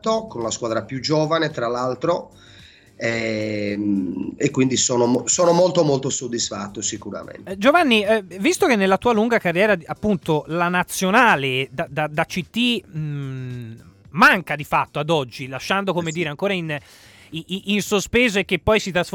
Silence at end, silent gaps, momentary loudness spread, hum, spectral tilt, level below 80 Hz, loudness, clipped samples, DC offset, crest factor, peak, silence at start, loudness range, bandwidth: 0.05 s; none; 13 LU; none; -4 dB/octave; -50 dBFS; -20 LUFS; under 0.1%; under 0.1%; 18 dB; -2 dBFS; 0.05 s; 5 LU; 19 kHz